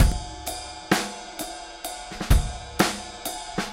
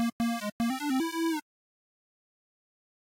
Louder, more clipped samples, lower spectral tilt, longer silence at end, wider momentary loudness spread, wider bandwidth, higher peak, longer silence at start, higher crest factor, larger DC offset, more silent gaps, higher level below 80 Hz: first, -28 LUFS vs -31 LUFS; neither; about the same, -4 dB/octave vs -4 dB/octave; second, 0 s vs 1.8 s; first, 11 LU vs 3 LU; about the same, 17 kHz vs 16.5 kHz; first, -4 dBFS vs -24 dBFS; about the same, 0 s vs 0 s; first, 22 dB vs 10 dB; neither; second, none vs 0.12-0.19 s, 0.52-0.59 s; first, -30 dBFS vs -66 dBFS